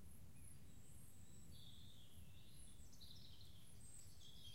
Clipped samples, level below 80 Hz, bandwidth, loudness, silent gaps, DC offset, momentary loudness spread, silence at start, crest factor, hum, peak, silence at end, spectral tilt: under 0.1%; -70 dBFS; 16 kHz; -63 LUFS; none; 0.2%; 3 LU; 0 s; 14 dB; none; -46 dBFS; 0 s; -3.5 dB/octave